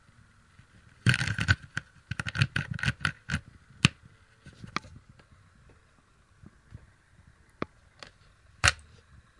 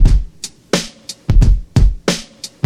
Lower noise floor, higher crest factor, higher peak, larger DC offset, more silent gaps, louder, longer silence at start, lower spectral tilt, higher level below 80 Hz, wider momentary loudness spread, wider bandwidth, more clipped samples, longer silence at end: first, -63 dBFS vs -32 dBFS; first, 32 dB vs 14 dB; about the same, -2 dBFS vs 0 dBFS; neither; neither; second, -30 LUFS vs -17 LUFS; first, 1.05 s vs 0 s; second, -3.5 dB/octave vs -5 dB/octave; second, -50 dBFS vs -14 dBFS; first, 24 LU vs 15 LU; about the same, 11.5 kHz vs 12.5 kHz; neither; first, 0.6 s vs 0.2 s